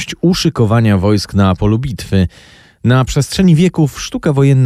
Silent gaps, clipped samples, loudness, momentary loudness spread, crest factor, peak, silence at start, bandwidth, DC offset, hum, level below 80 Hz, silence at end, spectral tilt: none; under 0.1%; -13 LUFS; 6 LU; 10 dB; -2 dBFS; 0 s; 14.5 kHz; under 0.1%; none; -32 dBFS; 0 s; -6.5 dB/octave